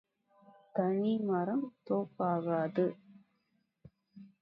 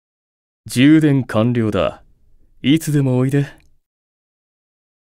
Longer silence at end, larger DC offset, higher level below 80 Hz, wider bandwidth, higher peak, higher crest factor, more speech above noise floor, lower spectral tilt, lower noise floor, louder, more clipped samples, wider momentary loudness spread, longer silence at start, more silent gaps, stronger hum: second, 0.15 s vs 1.5 s; neither; second, -80 dBFS vs -48 dBFS; second, 5.2 kHz vs 16 kHz; second, -18 dBFS vs 0 dBFS; about the same, 18 dB vs 18 dB; first, 46 dB vs 35 dB; first, -11 dB/octave vs -6.5 dB/octave; first, -78 dBFS vs -50 dBFS; second, -34 LUFS vs -16 LUFS; neither; second, 5 LU vs 11 LU; about the same, 0.75 s vs 0.65 s; neither; neither